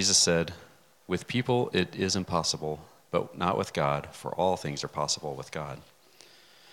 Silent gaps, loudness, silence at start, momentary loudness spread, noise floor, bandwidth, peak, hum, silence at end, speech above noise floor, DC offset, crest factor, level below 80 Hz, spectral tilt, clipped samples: none; -29 LUFS; 0 s; 11 LU; -57 dBFS; 17.5 kHz; -10 dBFS; none; 0.9 s; 28 dB; under 0.1%; 20 dB; -62 dBFS; -3 dB/octave; under 0.1%